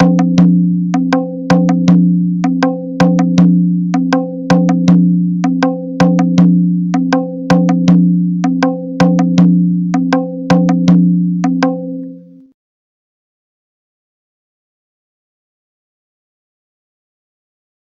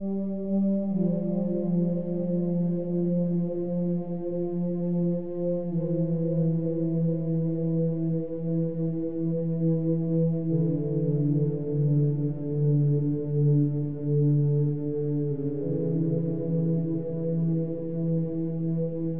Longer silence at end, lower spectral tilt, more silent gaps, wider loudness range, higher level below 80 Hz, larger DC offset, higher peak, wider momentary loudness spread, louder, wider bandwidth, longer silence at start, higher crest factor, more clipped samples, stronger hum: first, 5.8 s vs 0 s; second, -8 dB/octave vs -15 dB/octave; neither; about the same, 4 LU vs 3 LU; first, -48 dBFS vs -58 dBFS; second, under 0.1% vs 0.9%; first, 0 dBFS vs -14 dBFS; about the same, 6 LU vs 5 LU; first, -12 LUFS vs -27 LUFS; first, 7.2 kHz vs 1.9 kHz; about the same, 0 s vs 0 s; about the same, 12 dB vs 12 dB; first, 0.2% vs under 0.1%; neither